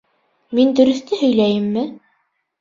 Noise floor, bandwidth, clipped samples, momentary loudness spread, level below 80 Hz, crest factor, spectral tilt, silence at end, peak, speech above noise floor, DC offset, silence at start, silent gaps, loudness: -67 dBFS; 7.6 kHz; under 0.1%; 10 LU; -60 dBFS; 16 dB; -6.5 dB/octave; 0.65 s; -2 dBFS; 51 dB; under 0.1%; 0.5 s; none; -17 LUFS